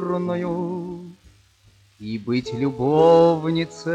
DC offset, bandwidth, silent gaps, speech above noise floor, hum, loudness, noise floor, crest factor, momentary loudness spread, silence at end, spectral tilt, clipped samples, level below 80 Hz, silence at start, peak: under 0.1%; 8.8 kHz; none; 36 dB; none; -20 LUFS; -56 dBFS; 18 dB; 18 LU; 0 s; -7.5 dB/octave; under 0.1%; -56 dBFS; 0 s; -4 dBFS